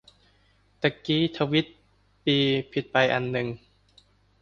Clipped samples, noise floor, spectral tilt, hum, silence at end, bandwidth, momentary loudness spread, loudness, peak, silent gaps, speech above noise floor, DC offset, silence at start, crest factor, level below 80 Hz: under 0.1%; -63 dBFS; -6.5 dB/octave; 50 Hz at -60 dBFS; 0.85 s; 7.2 kHz; 9 LU; -25 LUFS; -6 dBFS; none; 38 dB; under 0.1%; 0.8 s; 22 dB; -60 dBFS